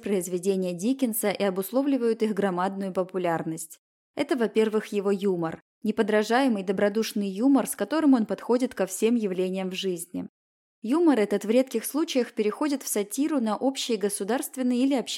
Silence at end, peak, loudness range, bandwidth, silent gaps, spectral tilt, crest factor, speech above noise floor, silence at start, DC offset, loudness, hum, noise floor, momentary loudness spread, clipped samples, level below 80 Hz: 0 s; -10 dBFS; 3 LU; 16.5 kHz; 3.78-4.14 s, 5.62-5.81 s, 10.29-10.82 s; -5 dB/octave; 16 dB; over 65 dB; 0 s; under 0.1%; -26 LUFS; none; under -90 dBFS; 8 LU; under 0.1%; -74 dBFS